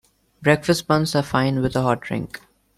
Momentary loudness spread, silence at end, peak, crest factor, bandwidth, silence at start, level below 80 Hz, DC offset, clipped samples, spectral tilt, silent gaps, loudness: 10 LU; 0.4 s; -2 dBFS; 20 dB; 14.5 kHz; 0.4 s; -48 dBFS; under 0.1%; under 0.1%; -5.5 dB/octave; none; -21 LUFS